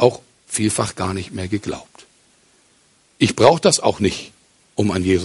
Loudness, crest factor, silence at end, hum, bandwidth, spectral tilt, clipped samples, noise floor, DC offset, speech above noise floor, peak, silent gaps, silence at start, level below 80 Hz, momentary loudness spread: -19 LUFS; 20 dB; 0 s; none; 11.5 kHz; -4.5 dB/octave; under 0.1%; -57 dBFS; under 0.1%; 39 dB; 0 dBFS; none; 0 s; -42 dBFS; 17 LU